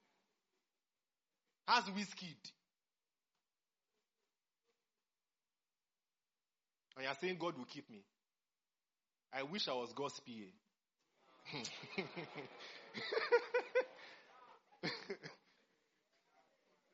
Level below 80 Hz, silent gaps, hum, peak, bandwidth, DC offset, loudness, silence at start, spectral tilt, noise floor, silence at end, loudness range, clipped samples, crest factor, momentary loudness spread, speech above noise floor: under -90 dBFS; none; none; -20 dBFS; 7.6 kHz; under 0.1%; -42 LUFS; 1.65 s; -1.5 dB/octave; under -90 dBFS; 1.55 s; 8 LU; under 0.1%; 28 dB; 22 LU; over 47 dB